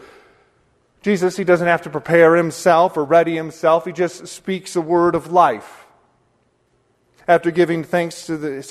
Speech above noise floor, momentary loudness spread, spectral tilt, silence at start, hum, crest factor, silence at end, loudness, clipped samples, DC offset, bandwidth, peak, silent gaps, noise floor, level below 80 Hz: 46 dB; 12 LU; -6 dB/octave; 1.05 s; none; 18 dB; 0 s; -17 LUFS; under 0.1%; under 0.1%; 13.5 kHz; 0 dBFS; none; -62 dBFS; -58 dBFS